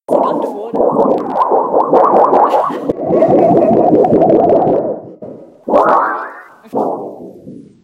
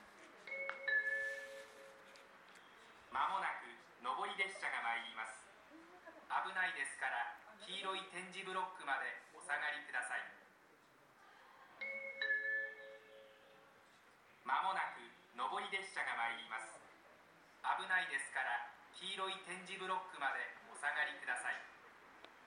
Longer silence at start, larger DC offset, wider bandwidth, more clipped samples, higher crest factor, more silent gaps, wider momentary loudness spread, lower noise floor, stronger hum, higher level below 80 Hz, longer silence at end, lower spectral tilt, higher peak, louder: about the same, 0.1 s vs 0 s; neither; second, 11.5 kHz vs 16 kHz; neither; second, 12 dB vs 20 dB; neither; second, 19 LU vs 22 LU; second, -34 dBFS vs -68 dBFS; neither; first, -50 dBFS vs -90 dBFS; first, 0.25 s vs 0 s; first, -9 dB/octave vs -1 dB/octave; first, 0 dBFS vs -24 dBFS; first, -12 LUFS vs -42 LUFS